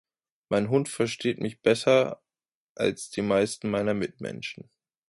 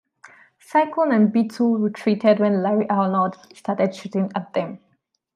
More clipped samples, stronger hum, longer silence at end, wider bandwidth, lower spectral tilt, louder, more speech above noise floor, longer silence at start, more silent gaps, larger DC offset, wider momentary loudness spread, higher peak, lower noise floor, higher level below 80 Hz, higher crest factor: neither; neither; about the same, 0.55 s vs 0.6 s; about the same, 11.5 kHz vs 11 kHz; second, -5 dB/octave vs -8 dB/octave; second, -27 LUFS vs -21 LUFS; first, over 64 dB vs 30 dB; first, 0.5 s vs 0.25 s; first, 2.55-2.75 s vs none; neither; first, 13 LU vs 9 LU; second, -8 dBFS vs -4 dBFS; first, under -90 dBFS vs -50 dBFS; first, -64 dBFS vs -72 dBFS; about the same, 18 dB vs 18 dB